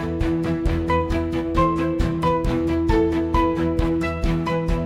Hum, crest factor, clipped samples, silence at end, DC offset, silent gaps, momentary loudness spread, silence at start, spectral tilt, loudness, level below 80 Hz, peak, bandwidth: none; 14 dB; under 0.1%; 0 s; under 0.1%; none; 3 LU; 0 s; -8 dB/octave; -22 LUFS; -28 dBFS; -6 dBFS; 12 kHz